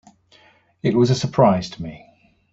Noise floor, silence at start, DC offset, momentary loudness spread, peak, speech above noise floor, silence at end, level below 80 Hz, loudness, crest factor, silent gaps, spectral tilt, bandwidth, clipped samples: -55 dBFS; 0.85 s; under 0.1%; 17 LU; -2 dBFS; 36 dB; 0.55 s; -52 dBFS; -19 LUFS; 20 dB; none; -7 dB/octave; 8 kHz; under 0.1%